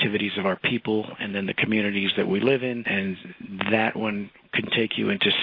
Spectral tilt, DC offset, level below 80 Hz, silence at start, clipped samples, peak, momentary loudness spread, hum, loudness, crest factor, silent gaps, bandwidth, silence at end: -8 dB/octave; under 0.1%; -64 dBFS; 0 s; under 0.1%; -4 dBFS; 7 LU; none; -24 LUFS; 20 dB; none; 5.2 kHz; 0 s